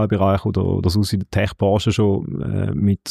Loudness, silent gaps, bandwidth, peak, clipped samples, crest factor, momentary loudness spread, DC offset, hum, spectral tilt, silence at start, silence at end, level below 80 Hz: -19 LUFS; none; 14 kHz; -8 dBFS; under 0.1%; 12 dB; 5 LU; under 0.1%; none; -7 dB/octave; 0 s; 0 s; -40 dBFS